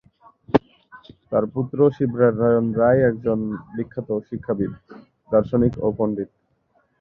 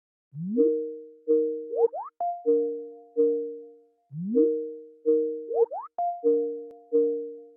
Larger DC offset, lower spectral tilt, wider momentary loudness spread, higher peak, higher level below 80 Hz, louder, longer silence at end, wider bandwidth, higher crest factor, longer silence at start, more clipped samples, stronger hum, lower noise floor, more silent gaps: neither; second, -10.5 dB/octave vs -13.5 dB/octave; about the same, 12 LU vs 13 LU; first, -2 dBFS vs -10 dBFS; first, -48 dBFS vs under -90 dBFS; first, -21 LUFS vs -27 LUFS; first, 0.75 s vs 0.1 s; first, 5.6 kHz vs 1.5 kHz; about the same, 20 dB vs 16 dB; first, 0.5 s vs 0.35 s; neither; neither; first, -65 dBFS vs -52 dBFS; neither